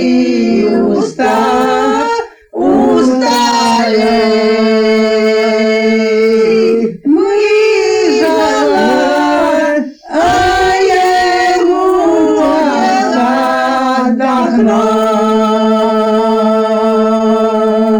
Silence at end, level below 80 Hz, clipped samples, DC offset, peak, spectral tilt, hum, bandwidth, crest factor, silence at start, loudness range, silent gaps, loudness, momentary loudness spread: 0 s; -42 dBFS; under 0.1%; under 0.1%; -2 dBFS; -4.5 dB/octave; none; 18.5 kHz; 8 dB; 0 s; 1 LU; none; -10 LUFS; 2 LU